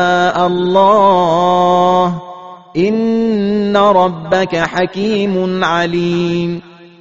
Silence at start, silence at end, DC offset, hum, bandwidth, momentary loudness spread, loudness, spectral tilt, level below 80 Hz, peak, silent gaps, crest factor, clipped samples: 0 s; 0.15 s; 0.5%; none; 7.8 kHz; 8 LU; -13 LUFS; -4.5 dB/octave; -50 dBFS; 0 dBFS; none; 12 dB; under 0.1%